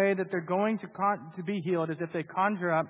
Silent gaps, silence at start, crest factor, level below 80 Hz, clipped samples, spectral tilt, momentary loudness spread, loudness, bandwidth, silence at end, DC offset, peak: none; 0 s; 16 dB; -78 dBFS; under 0.1%; -6 dB/octave; 6 LU; -30 LUFS; 4 kHz; 0 s; under 0.1%; -14 dBFS